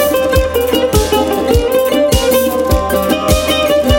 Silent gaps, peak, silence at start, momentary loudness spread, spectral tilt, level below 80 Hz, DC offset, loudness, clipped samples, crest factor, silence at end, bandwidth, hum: none; 0 dBFS; 0 s; 2 LU; -4.5 dB/octave; -22 dBFS; under 0.1%; -12 LUFS; under 0.1%; 12 dB; 0 s; 17 kHz; none